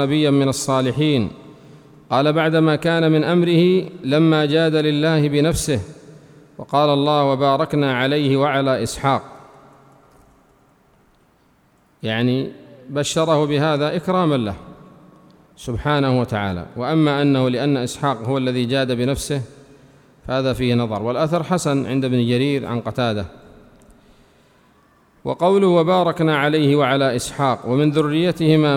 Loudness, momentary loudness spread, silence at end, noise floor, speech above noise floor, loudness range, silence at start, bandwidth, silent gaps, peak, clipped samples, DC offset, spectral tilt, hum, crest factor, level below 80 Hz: -18 LUFS; 9 LU; 0 s; -57 dBFS; 40 dB; 7 LU; 0 s; 16 kHz; none; -4 dBFS; under 0.1%; under 0.1%; -6 dB/octave; none; 16 dB; -46 dBFS